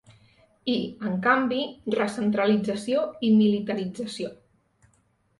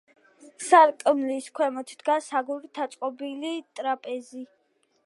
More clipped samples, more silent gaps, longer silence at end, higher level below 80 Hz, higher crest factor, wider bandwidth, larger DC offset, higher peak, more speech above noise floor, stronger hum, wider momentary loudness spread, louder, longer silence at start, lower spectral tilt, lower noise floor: neither; neither; first, 1.05 s vs 0.6 s; first, -66 dBFS vs -88 dBFS; about the same, 18 dB vs 20 dB; about the same, 11.5 kHz vs 11.5 kHz; neither; about the same, -8 dBFS vs -6 dBFS; about the same, 42 dB vs 44 dB; neither; second, 12 LU vs 18 LU; about the same, -25 LUFS vs -25 LUFS; first, 0.65 s vs 0.45 s; first, -6 dB/octave vs -2 dB/octave; about the same, -66 dBFS vs -69 dBFS